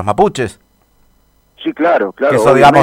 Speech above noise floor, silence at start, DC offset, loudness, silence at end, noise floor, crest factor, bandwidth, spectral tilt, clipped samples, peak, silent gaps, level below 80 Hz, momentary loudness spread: 43 dB; 0 s; under 0.1%; -12 LUFS; 0 s; -53 dBFS; 12 dB; 16 kHz; -6 dB/octave; 0.5%; 0 dBFS; none; -42 dBFS; 16 LU